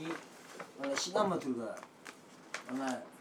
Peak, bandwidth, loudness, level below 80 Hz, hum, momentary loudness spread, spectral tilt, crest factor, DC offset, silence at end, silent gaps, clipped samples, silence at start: -18 dBFS; 17 kHz; -37 LUFS; -82 dBFS; none; 19 LU; -3.5 dB/octave; 22 dB; under 0.1%; 0 s; none; under 0.1%; 0 s